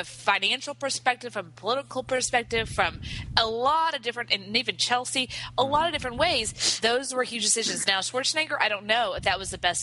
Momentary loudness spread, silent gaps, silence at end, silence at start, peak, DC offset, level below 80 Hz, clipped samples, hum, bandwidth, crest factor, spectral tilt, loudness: 6 LU; none; 0 s; 0 s; -2 dBFS; under 0.1%; -50 dBFS; under 0.1%; none; 11.5 kHz; 26 dB; -1.5 dB/octave; -25 LUFS